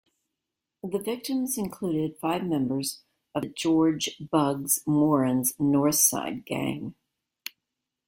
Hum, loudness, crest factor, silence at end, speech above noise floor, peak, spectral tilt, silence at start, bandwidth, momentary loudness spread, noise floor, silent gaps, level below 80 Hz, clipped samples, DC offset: none; -26 LUFS; 20 dB; 1.15 s; 60 dB; -8 dBFS; -4.5 dB/octave; 0.85 s; 16.5 kHz; 16 LU; -86 dBFS; none; -64 dBFS; under 0.1%; under 0.1%